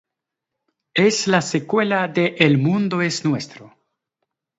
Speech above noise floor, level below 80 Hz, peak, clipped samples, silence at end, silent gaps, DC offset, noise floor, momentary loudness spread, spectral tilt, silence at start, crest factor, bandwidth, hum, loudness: 64 dB; -66 dBFS; -2 dBFS; under 0.1%; 0.9 s; none; under 0.1%; -83 dBFS; 8 LU; -5 dB/octave; 0.95 s; 20 dB; 8 kHz; none; -19 LUFS